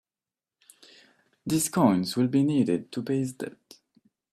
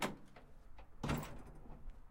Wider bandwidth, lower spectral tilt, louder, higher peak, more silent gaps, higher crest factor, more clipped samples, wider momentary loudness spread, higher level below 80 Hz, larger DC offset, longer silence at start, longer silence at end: about the same, 15.5 kHz vs 16.5 kHz; about the same, -5.5 dB/octave vs -5 dB/octave; first, -26 LUFS vs -46 LUFS; first, -8 dBFS vs -26 dBFS; neither; about the same, 20 dB vs 20 dB; neither; second, 15 LU vs 20 LU; second, -66 dBFS vs -54 dBFS; neither; first, 1.45 s vs 0 s; first, 0.8 s vs 0 s